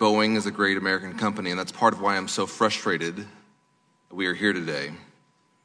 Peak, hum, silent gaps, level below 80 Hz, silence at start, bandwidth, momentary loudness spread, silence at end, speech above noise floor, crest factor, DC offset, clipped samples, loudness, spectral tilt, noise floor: -4 dBFS; none; none; -72 dBFS; 0 s; 11 kHz; 12 LU; 0.6 s; 40 dB; 22 dB; under 0.1%; under 0.1%; -25 LUFS; -4 dB/octave; -66 dBFS